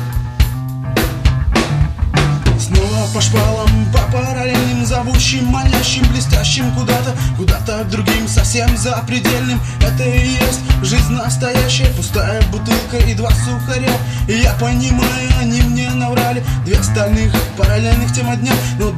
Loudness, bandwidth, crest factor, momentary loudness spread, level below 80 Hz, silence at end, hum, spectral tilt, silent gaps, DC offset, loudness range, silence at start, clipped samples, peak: -15 LUFS; 14 kHz; 14 dB; 4 LU; -18 dBFS; 0 s; none; -5 dB/octave; none; under 0.1%; 1 LU; 0 s; under 0.1%; 0 dBFS